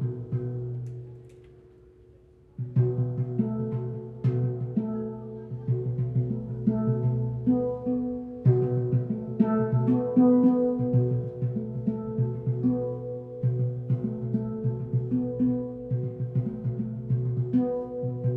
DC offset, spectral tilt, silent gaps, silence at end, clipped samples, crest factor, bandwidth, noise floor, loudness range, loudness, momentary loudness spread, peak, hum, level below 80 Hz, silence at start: under 0.1%; -13 dB/octave; none; 0 s; under 0.1%; 18 dB; 2.6 kHz; -55 dBFS; 6 LU; -28 LUFS; 9 LU; -10 dBFS; none; -56 dBFS; 0 s